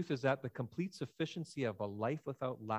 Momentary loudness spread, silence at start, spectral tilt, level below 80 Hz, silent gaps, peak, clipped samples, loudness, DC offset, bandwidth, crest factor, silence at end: 6 LU; 0 s; -6.5 dB/octave; -74 dBFS; none; -20 dBFS; under 0.1%; -40 LUFS; under 0.1%; 16 kHz; 20 dB; 0 s